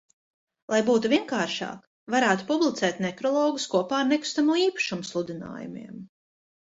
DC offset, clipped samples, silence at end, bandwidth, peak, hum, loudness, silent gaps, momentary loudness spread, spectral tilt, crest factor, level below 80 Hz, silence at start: under 0.1%; under 0.1%; 0.6 s; 8 kHz; -6 dBFS; none; -25 LUFS; 1.87-2.06 s; 15 LU; -4 dB/octave; 20 dB; -70 dBFS; 0.7 s